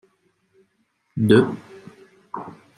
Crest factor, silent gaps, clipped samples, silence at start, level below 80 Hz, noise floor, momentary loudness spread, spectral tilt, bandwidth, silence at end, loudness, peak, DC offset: 22 dB; none; under 0.1%; 1.15 s; -60 dBFS; -69 dBFS; 20 LU; -7.5 dB/octave; 13.5 kHz; 0.25 s; -18 LUFS; -2 dBFS; under 0.1%